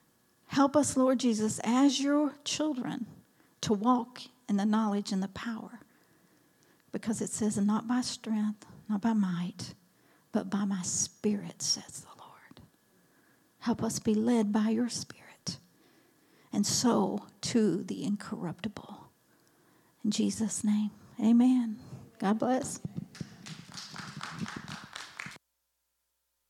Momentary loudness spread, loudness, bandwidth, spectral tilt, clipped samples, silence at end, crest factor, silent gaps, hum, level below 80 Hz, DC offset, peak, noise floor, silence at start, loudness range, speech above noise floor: 18 LU; -31 LUFS; 14 kHz; -4.5 dB/octave; under 0.1%; 1.15 s; 18 dB; none; none; -72 dBFS; under 0.1%; -12 dBFS; -81 dBFS; 0.5 s; 5 LU; 51 dB